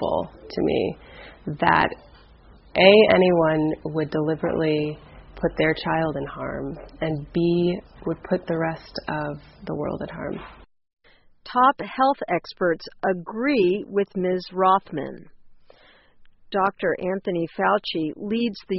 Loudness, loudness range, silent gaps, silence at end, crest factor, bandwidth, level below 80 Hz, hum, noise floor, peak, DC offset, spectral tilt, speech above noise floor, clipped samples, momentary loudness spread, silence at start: -23 LUFS; 7 LU; none; 0 s; 24 dB; 5.8 kHz; -50 dBFS; none; -53 dBFS; 0 dBFS; under 0.1%; -4 dB/octave; 31 dB; under 0.1%; 13 LU; 0 s